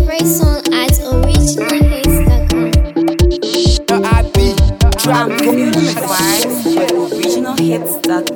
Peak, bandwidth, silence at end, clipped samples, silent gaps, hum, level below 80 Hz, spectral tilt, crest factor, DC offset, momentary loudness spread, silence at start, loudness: 0 dBFS; 19.5 kHz; 0 s; under 0.1%; none; none; -16 dBFS; -5 dB/octave; 12 dB; under 0.1%; 3 LU; 0 s; -13 LUFS